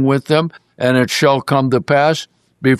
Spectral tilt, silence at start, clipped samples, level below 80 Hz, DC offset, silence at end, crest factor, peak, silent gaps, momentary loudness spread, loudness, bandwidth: -5.5 dB/octave; 0 s; under 0.1%; -56 dBFS; under 0.1%; 0 s; 14 dB; -2 dBFS; none; 8 LU; -15 LUFS; 13.5 kHz